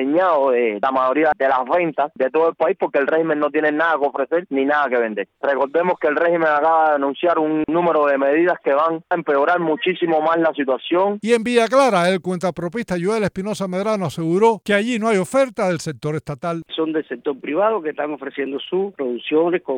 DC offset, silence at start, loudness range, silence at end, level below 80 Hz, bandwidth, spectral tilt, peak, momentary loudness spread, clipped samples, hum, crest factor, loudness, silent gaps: under 0.1%; 0 s; 4 LU; 0 s; -60 dBFS; 15.5 kHz; -5.5 dB/octave; -2 dBFS; 8 LU; under 0.1%; none; 16 dB; -19 LUFS; none